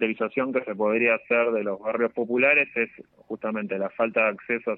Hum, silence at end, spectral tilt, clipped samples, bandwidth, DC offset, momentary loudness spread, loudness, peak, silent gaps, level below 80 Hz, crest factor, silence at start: none; 0 s; -9 dB/octave; under 0.1%; 4.1 kHz; under 0.1%; 10 LU; -24 LUFS; -8 dBFS; none; -74 dBFS; 16 dB; 0 s